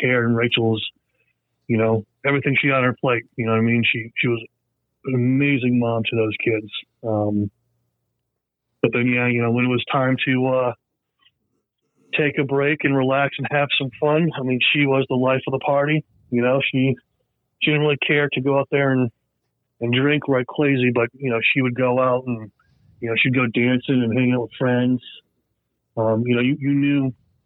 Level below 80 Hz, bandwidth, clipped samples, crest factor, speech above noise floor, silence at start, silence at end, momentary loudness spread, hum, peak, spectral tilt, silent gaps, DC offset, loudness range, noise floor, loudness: -64 dBFS; 4.1 kHz; under 0.1%; 18 dB; 59 dB; 0 s; 0.35 s; 8 LU; none; -2 dBFS; -10 dB/octave; none; under 0.1%; 3 LU; -79 dBFS; -20 LUFS